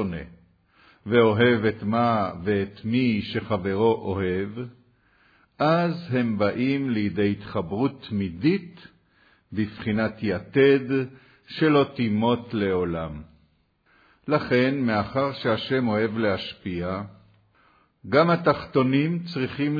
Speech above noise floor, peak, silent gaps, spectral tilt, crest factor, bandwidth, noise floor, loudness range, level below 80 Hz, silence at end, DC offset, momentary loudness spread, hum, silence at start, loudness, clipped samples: 41 dB; -6 dBFS; none; -9 dB/octave; 18 dB; 5 kHz; -64 dBFS; 3 LU; -56 dBFS; 0 s; under 0.1%; 11 LU; none; 0 s; -24 LUFS; under 0.1%